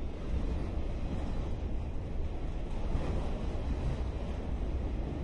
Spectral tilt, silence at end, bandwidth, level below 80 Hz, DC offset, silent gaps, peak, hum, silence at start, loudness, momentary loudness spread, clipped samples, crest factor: -8 dB/octave; 0 s; 8.8 kHz; -36 dBFS; under 0.1%; none; -20 dBFS; none; 0 s; -38 LUFS; 4 LU; under 0.1%; 14 dB